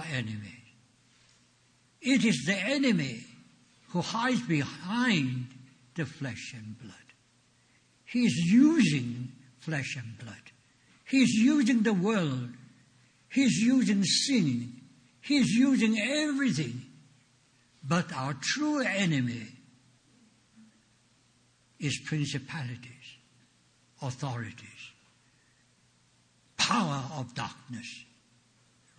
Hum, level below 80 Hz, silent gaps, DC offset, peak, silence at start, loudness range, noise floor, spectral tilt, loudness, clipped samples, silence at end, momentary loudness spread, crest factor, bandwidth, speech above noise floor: none; -70 dBFS; none; under 0.1%; -12 dBFS; 0 s; 11 LU; -66 dBFS; -4.5 dB/octave; -28 LUFS; under 0.1%; 0.95 s; 20 LU; 18 dB; 10 kHz; 38 dB